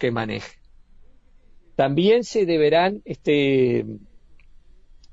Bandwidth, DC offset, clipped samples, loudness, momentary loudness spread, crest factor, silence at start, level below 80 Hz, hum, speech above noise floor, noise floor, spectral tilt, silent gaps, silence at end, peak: 7.8 kHz; under 0.1%; under 0.1%; -21 LUFS; 15 LU; 16 dB; 0 s; -52 dBFS; none; 30 dB; -50 dBFS; -6.5 dB/octave; none; 1.15 s; -6 dBFS